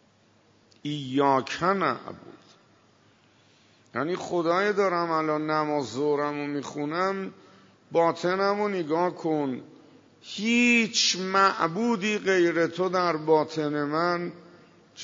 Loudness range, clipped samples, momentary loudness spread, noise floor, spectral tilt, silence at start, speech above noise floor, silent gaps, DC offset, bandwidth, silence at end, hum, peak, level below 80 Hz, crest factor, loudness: 6 LU; under 0.1%; 11 LU; -61 dBFS; -4 dB/octave; 0.85 s; 36 dB; none; under 0.1%; 7.8 kHz; 0 s; none; -8 dBFS; -74 dBFS; 20 dB; -25 LUFS